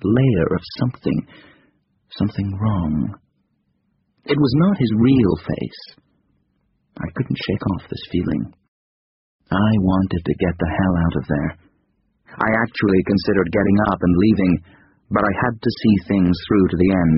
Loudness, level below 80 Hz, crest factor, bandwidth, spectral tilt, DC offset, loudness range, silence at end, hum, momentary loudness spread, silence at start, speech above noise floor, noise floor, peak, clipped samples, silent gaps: -19 LUFS; -40 dBFS; 18 dB; 5.8 kHz; -6.5 dB/octave; under 0.1%; 8 LU; 0 s; none; 10 LU; 0 s; 49 dB; -67 dBFS; -2 dBFS; under 0.1%; 8.68-9.39 s